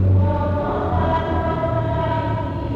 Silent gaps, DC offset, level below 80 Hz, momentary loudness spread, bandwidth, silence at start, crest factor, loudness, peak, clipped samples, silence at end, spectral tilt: none; under 0.1%; -32 dBFS; 4 LU; 4.8 kHz; 0 s; 12 dB; -21 LUFS; -8 dBFS; under 0.1%; 0 s; -9.5 dB/octave